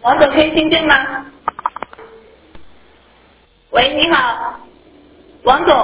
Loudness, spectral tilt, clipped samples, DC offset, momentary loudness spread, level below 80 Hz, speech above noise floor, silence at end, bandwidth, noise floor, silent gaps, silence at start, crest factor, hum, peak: -14 LUFS; -7.5 dB/octave; under 0.1%; under 0.1%; 14 LU; -44 dBFS; 38 dB; 0 s; 4 kHz; -50 dBFS; none; 0.05 s; 16 dB; none; 0 dBFS